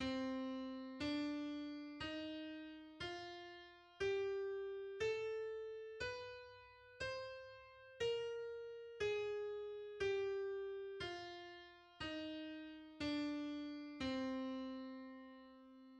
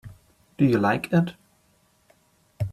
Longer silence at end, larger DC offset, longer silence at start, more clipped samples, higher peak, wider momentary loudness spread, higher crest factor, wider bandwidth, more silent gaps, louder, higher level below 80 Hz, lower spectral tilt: about the same, 0 s vs 0 s; neither; about the same, 0 s vs 0.05 s; neither; second, -30 dBFS vs -8 dBFS; first, 14 LU vs 11 LU; about the same, 16 dB vs 18 dB; second, 9.8 kHz vs 14 kHz; neither; second, -46 LUFS vs -23 LUFS; second, -72 dBFS vs -56 dBFS; second, -5 dB/octave vs -8 dB/octave